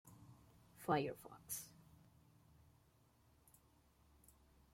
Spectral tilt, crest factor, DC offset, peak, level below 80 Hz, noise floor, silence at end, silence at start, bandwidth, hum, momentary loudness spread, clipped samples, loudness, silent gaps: -4.5 dB/octave; 26 dB; under 0.1%; -24 dBFS; -76 dBFS; -73 dBFS; 3.05 s; 0.05 s; 16.5 kHz; none; 27 LU; under 0.1%; -44 LUFS; none